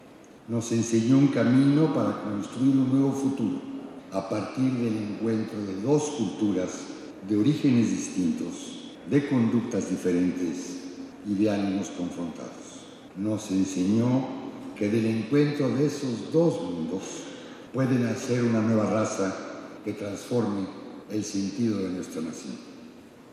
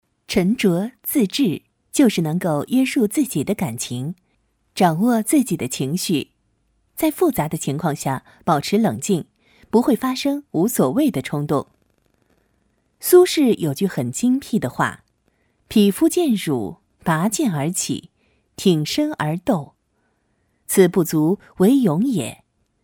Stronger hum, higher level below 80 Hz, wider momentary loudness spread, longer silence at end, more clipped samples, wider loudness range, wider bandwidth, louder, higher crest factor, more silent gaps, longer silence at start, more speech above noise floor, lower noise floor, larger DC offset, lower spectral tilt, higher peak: neither; second, -68 dBFS vs -56 dBFS; first, 16 LU vs 9 LU; second, 0 s vs 0.5 s; neither; first, 6 LU vs 2 LU; second, 13 kHz vs 20 kHz; second, -27 LUFS vs -20 LUFS; about the same, 16 dB vs 18 dB; neither; second, 0 s vs 0.3 s; second, 22 dB vs 48 dB; second, -48 dBFS vs -67 dBFS; neither; about the same, -6.5 dB/octave vs -5.5 dB/octave; second, -10 dBFS vs -2 dBFS